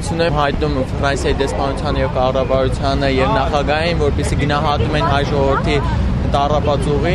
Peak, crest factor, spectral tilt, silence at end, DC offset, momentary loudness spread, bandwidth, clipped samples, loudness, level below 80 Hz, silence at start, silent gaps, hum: -2 dBFS; 14 dB; -6 dB/octave; 0 s; under 0.1%; 3 LU; 12 kHz; under 0.1%; -17 LUFS; -24 dBFS; 0 s; none; none